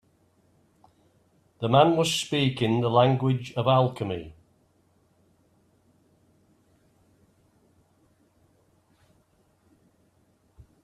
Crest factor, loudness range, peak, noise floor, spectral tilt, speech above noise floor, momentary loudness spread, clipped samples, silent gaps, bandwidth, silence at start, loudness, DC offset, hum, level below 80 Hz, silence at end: 24 dB; 8 LU; -4 dBFS; -66 dBFS; -6 dB/octave; 43 dB; 13 LU; under 0.1%; none; 13.5 kHz; 1.6 s; -24 LUFS; under 0.1%; none; -64 dBFS; 6.5 s